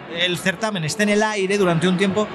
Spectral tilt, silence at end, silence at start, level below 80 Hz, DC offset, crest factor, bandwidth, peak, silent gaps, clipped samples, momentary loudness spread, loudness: -4.5 dB/octave; 0 s; 0 s; -56 dBFS; under 0.1%; 14 dB; 13.5 kHz; -6 dBFS; none; under 0.1%; 4 LU; -19 LUFS